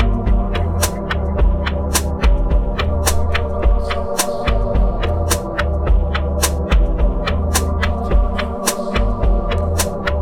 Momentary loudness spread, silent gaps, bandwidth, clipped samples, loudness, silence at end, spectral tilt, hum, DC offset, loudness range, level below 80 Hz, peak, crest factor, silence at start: 2 LU; none; 17 kHz; under 0.1%; -19 LUFS; 0 s; -4.5 dB/octave; none; under 0.1%; 1 LU; -18 dBFS; -4 dBFS; 12 dB; 0 s